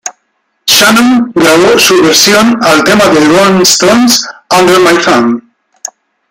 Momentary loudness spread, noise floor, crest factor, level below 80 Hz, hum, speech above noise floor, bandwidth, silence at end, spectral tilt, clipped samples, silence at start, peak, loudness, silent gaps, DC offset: 13 LU; -60 dBFS; 6 dB; -44 dBFS; none; 55 dB; over 20 kHz; 0.9 s; -3 dB/octave; 0.6%; 0.05 s; 0 dBFS; -5 LUFS; none; under 0.1%